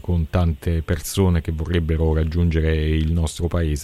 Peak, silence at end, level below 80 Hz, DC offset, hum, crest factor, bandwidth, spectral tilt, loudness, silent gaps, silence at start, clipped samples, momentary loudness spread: -6 dBFS; 0 s; -26 dBFS; under 0.1%; none; 14 dB; 13.5 kHz; -6.5 dB/octave; -21 LUFS; none; 0.05 s; under 0.1%; 4 LU